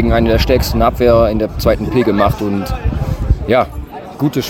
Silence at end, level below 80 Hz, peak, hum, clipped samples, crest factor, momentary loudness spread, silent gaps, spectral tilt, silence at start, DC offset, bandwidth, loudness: 0 s; -22 dBFS; 0 dBFS; none; under 0.1%; 14 dB; 9 LU; none; -6.5 dB/octave; 0 s; under 0.1%; 17 kHz; -14 LUFS